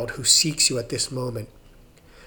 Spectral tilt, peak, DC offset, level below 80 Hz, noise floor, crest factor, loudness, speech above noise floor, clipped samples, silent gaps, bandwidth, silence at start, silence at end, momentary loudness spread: -2 dB/octave; -4 dBFS; under 0.1%; -50 dBFS; -50 dBFS; 22 dB; -20 LUFS; 27 dB; under 0.1%; none; over 20 kHz; 0 s; 0 s; 15 LU